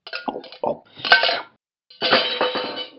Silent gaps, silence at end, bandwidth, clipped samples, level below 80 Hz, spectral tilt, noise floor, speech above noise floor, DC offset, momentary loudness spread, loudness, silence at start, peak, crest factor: none; 0.1 s; 7.2 kHz; under 0.1%; -70 dBFS; 1.5 dB/octave; -54 dBFS; 33 dB; under 0.1%; 14 LU; -20 LUFS; 0.05 s; 0 dBFS; 22 dB